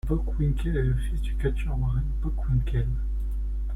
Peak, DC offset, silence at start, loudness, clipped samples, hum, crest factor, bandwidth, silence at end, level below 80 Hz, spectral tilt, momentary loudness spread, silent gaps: -12 dBFS; under 0.1%; 0.05 s; -28 LUFS; under 0.1%; none; 12 dB; 10.5 kHz; 0 s; -28 dBFS; -8.5 dB/octave; 5 LU; none